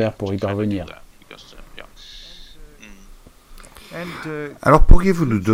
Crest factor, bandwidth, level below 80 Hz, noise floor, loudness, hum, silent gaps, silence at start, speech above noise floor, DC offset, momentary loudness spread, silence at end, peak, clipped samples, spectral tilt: 18 dB; 10 kHz; -20 dBFS; -44 dBFS; -20 LUFS; none; none; 0 s; 30 dB; under 0.1%; 26 LU; 0 s; 0 dBFS; 0.4%; -7.5 dB/octave